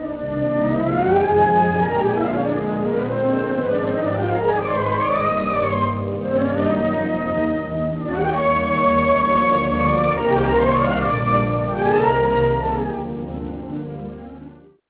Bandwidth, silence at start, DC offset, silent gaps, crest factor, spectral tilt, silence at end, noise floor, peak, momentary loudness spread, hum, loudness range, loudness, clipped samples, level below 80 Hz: 4 kHz; 0 s; under 0.1%; none; 14 dB; -11 dB/octave; 0.35 s; -42 dBFS; -4 dBFS; 9 LU; none; 3 LU; -20 LUFS; under 0.1%; -38 dBFS